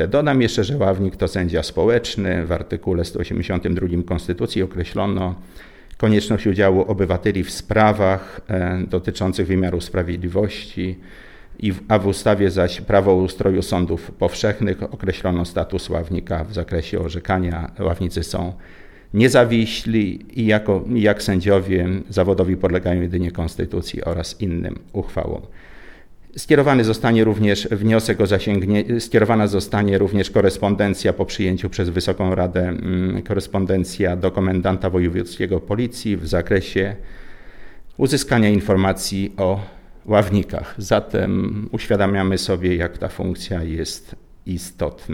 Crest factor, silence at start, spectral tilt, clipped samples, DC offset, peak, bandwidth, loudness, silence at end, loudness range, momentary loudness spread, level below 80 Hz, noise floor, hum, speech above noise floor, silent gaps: 18 dB; 0 s; -6.5 dB/octave; under 0.1%; under 0.1%; 0 dBFS; 16.5 kHz; -20 LUFS; 0 s; 5 LU; 9 LU; -36 dBFS; -40 dBFS; none; 21 dB; none